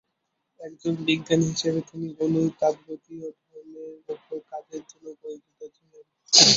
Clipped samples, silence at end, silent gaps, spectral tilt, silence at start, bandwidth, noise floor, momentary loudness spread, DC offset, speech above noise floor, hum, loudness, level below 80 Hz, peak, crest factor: under 0.1%; 0 s; none; -3 dB/octave; 0.6 s; 8.2 kHz; -78 dBFS; 21 LU; under 0.1%; 50 dB; none; -24 LUFS; -64 dBFS; 0 dBFS; 26 dB